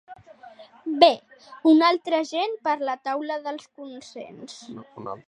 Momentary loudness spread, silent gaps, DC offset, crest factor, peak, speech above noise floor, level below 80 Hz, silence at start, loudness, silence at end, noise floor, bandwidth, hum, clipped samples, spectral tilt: 22 LU; none; under 0.1%; 24 dB; -2 dBFS; 24 dB; -76 dBFS; 0.1 s; -22 LUFS; 0.1 s; -48 dBFS; 10 kHz; none; under 0.1%; -4 dB/octave